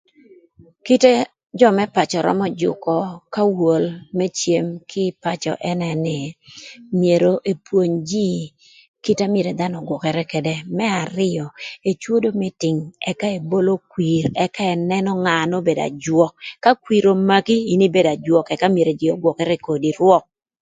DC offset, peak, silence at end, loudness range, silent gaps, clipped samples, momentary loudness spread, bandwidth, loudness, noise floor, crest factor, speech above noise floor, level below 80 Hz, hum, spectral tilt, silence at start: under 0.1%; 0 dBFS; 0.4 s; 5 LU; 8.88-8.94 s; under 0.1%; 9 LU; 9.4 kHz; -19 LUFS; -50 dBFS; 18 dB; 32 dB; -60 dBFS; none; -6 dB/octave; 0.85 s